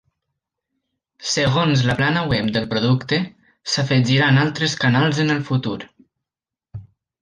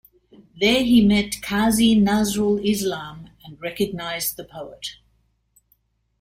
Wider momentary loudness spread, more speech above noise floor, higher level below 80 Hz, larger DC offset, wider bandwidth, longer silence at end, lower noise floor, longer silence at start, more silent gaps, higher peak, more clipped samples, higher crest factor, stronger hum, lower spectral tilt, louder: about the same, 16 LU vs 18 LU; first, 70 dB vs 45 dB; about the same, -50 dBFS vs -46 dBFS; neither; second, 9.8 kHz vs 16 kHz; second, 0.4 s vs 1.3 s; first, -89 dBFS vs -65 dBFS; first, 1.2 s vs 0.55 s; neither; about the same, -4 dBFS vs -6 dBFS; neither; about the same, 16 dB vs 16 dB; neither; about the same, -5 dB/octave vs -4.5 dB/octave; about the same, -19 LUFS vs -20 LUFS